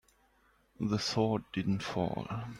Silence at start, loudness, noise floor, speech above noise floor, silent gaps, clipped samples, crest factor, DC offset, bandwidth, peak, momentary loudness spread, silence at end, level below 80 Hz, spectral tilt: 0.8 s; -34 LUFS; -69 dBFS; 36 dB; none; under 0.1%; 18 dB; under 0.1%; 12.5 kHz; -16 dBFS; 6 LU; 0 s; -60 dBFS; -6 dB/octave